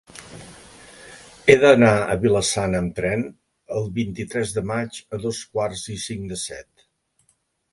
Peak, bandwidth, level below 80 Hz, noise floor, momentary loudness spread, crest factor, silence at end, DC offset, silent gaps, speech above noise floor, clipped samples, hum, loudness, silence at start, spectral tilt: 0 dBFS; 11.5 kHz; -48 dBFS; -67 dBFS; 26 LU; 22 dB; 1.1 s; under 0.1%; none; 46 dB; under 0.1%; none; -21 LUFS; 0.15 s; -5 dB/octave